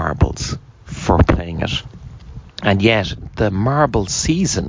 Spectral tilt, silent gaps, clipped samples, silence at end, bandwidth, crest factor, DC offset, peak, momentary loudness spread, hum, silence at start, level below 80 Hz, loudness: -5 dB/octave; none; under 0.1%; 0 s; 7.6 kHz; 16 dB; under 0.1%; -2 dBFS; 20 LU; none; 0 s; -26 dBFS; -18 LUFS